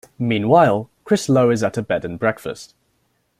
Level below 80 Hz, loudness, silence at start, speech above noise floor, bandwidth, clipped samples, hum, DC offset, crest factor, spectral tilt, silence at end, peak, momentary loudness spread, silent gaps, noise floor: -56 dBFS; -18 LUFS; 0.2 s; 48 dB; 15.5 kHz; under 0.1%; none; under 0.1%; 18 dB; -6 dB/octave; 0.75 s; -2 dBFS; 13 LU; none; -66 dBFS